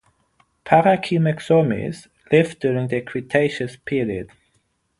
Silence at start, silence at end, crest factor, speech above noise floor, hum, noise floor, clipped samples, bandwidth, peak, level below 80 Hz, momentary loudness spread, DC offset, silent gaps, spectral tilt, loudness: 0.65 s; 0.75 s; 20 dB; 48 dB; none; -67 dBFS; under 0.1%; 11.5 kHz; 0 dBFS; -54 dBFS; 13 LU; under 0.1%; none; -7 dB/octave; -20 LUFS